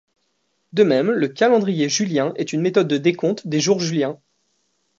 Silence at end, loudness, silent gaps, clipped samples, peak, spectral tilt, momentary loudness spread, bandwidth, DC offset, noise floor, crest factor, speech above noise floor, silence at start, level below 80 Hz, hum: 0.85 s; -19 LUFS; none; under 0.1%; -2 dBFS; -5 dB/octave; 7 LU; 7.8 kHz; under 0.1%; -69 dBFS; 18 dB; 51 dB; 0.75 s; -68 dBFS; none